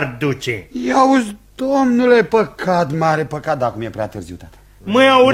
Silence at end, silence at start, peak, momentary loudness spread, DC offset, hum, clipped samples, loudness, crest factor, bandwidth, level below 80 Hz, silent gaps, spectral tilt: 0 s; 0 s; 0 dBFS; 14 LU; under 0.1%; none; under 0.1%; -16 LUFS; 16 dB; 14.5 kHz; -48 dBFS; none; -5.5 dB/octave